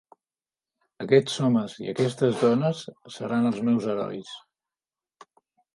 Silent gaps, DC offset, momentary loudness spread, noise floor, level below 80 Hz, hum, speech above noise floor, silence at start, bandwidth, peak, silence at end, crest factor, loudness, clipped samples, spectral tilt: none; under 0.1%; 16 LU; under -90 dBFS; -72 dBFS; none; over 66 dB; 1 s; 11.5 kHz; -6 dBFS; 1.4 s; 20 dB; -25 LUFS; under 0.1%; -6.5 dB/octave